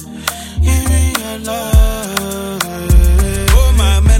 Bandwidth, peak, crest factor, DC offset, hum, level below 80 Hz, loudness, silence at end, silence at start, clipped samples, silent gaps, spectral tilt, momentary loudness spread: 17 kHz; 0 dBFS; 12 dB; under 0.1%; none; -12 dBFS; -14 LUFS; 0 s; 0 s; under 0.1%; none; -4.5 dB/octave; 10 LU